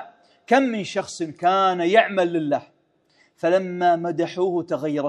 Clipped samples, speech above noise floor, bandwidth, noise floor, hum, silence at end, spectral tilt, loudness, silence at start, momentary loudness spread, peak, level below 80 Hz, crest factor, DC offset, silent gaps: under 0.1%; 41 dB; 10.5 kHz; -62 dBFS; none; 0 s; -5.5 dB/octave; -21 LUFS; 0 s; 9 LU; -2 dBFS; -74 dBFS; 20 dB; under 0.1%; none